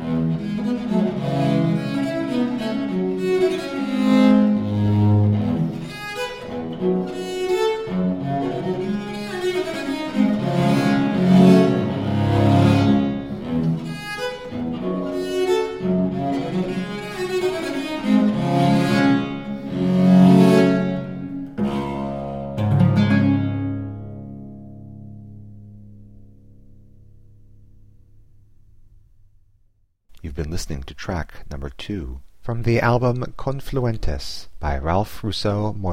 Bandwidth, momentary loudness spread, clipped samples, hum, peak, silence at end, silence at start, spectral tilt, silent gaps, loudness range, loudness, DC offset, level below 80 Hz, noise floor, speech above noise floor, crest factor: 15 kHz; 14 LU; under 0.1%; none; -2 dBFS; 0 s; 0 s; -7.5 dB/octave; none; 13 LU; -20 LUFS; under 0.1%; -40 dBFS; -60 dBFS; 38 dB; 20 dB